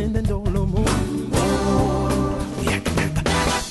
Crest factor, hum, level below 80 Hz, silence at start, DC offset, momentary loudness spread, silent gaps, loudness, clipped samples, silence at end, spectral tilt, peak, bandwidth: 12 dB; none; -28 dBFS; 0 s; under 0.1%; 3 LU; none; -21 LUFS; under 0.1%; 0 s; -5.5 dB/octave; -8 dBFS; 12.5 kHz